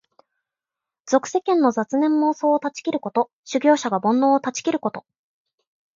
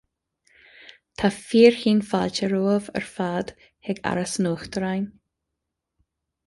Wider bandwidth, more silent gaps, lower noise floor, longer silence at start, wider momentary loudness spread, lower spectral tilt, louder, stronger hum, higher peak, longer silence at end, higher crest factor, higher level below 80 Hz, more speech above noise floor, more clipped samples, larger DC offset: second, 7.6 kHz vs 11.5 kHz; first, 3.33-3.43 s vs none; first, -88 dBFS vs -82 dBFS; second, 1.05 s vs 1.2 s; second, 7 LU vs 16 LU; about the same, -4.5 dB/octave vs -5.5 dB/octave; about the same, -21 LUFS vs -23 LUFS; neither; about the same, -4 dBFS vs -2 dBFS; second, 0.95 s vs 1.4 s; about the same, 18 dB vs 22 dB; second, -72 dBFS vs -58 dBFS; first, 68 dB vs 60 dB; neither; neither